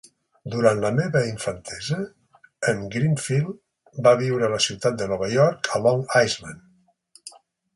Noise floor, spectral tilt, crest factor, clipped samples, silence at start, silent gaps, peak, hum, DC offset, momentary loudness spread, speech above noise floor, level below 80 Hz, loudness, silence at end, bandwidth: -57 dBFS; -5 dB/octave; 22 dB; under 0.1%; 0.45 s; none; -2 dBFS; none; under 0.1%; 21 LU; 35 dB; -56 dBFS; -22 LUFS; 0.45 s; 11.5 kHz